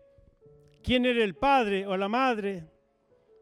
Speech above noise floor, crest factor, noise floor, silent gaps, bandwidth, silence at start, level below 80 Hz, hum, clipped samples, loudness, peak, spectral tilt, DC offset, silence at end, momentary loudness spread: 40 dB; 16 dB; -66 dBFS; none; 11.5 kHz; 0.85 s; -52 dBFS; none; under 0.1%; -26 LUFS; -12 dBFS; -5.5 dB/octave; under 0.1%; 0.75 s; 12 LU